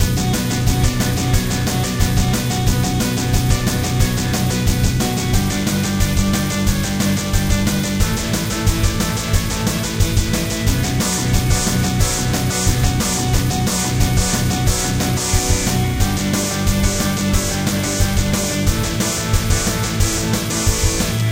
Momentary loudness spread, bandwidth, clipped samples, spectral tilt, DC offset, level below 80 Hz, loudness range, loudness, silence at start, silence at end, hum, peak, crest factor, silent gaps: 2 LU; 17 kHz; under 0.1%; -4 dB/octave; 0.3%; -24 dBFS; 1 LU; -18 LUFS; 0 s; 0 s; none; -2 dBFS; 16 dB; none